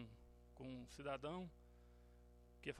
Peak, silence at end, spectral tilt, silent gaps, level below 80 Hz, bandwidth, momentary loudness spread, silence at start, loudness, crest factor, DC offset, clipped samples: -32 dBFS; 0 s; -6 dB/octave; none; -68 dBFS; 13 kHz; 20 LU; 0 s; -52 LUFS; 22 dB; under 0.1%; under 0.1%